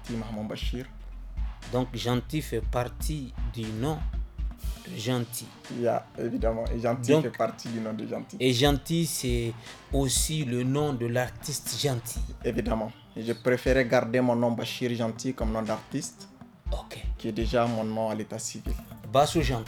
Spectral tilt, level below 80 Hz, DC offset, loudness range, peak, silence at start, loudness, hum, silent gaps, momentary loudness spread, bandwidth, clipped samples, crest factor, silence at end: -5 dB/octave; -38 dBFS; under 0.1%; 5 LU; -8 dBFS; 0 s; -29 LUFS; none; none; 13 LU; 19 kHz; under 0.1%; 20 dB; 0 s